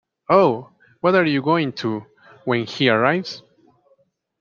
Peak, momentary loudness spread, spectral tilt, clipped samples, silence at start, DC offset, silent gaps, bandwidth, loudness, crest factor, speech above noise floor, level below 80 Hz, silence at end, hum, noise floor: -2 dBFS; 15 LU; -6.5 dB/octave; under 0.1%; 0.3 s; under 0.1%; none; 7.2 kHz; -19 LUFS; 20 dB; 44 dB; -64 dBFS; 1 s; none; -62 dBFS